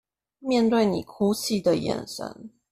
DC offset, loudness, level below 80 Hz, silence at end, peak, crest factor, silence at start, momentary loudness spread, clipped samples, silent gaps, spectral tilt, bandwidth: under 0.1%; -24 LUFS; -60 dBFS; 0.25 s; -10 dBFS; 16 dB; 0.4 s; 14 LU; under 0.1%; none; -5 dB/octave; 15 kHz